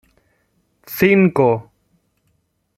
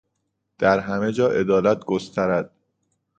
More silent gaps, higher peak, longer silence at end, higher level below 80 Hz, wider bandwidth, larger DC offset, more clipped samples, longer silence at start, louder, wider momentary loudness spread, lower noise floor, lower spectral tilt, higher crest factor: neither; about the same, -2 dBFS vs -4 dBFS; first, 1.15 s vs 0.7 s; about the same, -56 dBFS vs -56 dBFS; first, 15 kHz vs 8.8 kHz; neither; neither; first, 0.9 s vs 0.6 s; first, -15 LUFS vs -21 LUFS; first, 12 LU vs 7 LU; second, -66 dBFS vs -76 dBFS; about the same, -7.5 dB/octave vs -6.5 dB/octave; about the same, 18 dB vs 20 dB